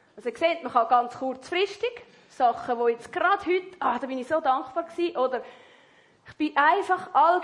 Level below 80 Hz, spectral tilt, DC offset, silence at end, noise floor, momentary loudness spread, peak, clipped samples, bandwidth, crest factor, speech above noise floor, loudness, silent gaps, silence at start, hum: -70 dBFS; -4 dB/octave; under 0.1%; 0 s; -58 dBFS; 11 LU; -8 dBFS; under 0.1%; 11 kHz; 18 dB; 33 dB; -26 LUFS; none; 0.15 s; none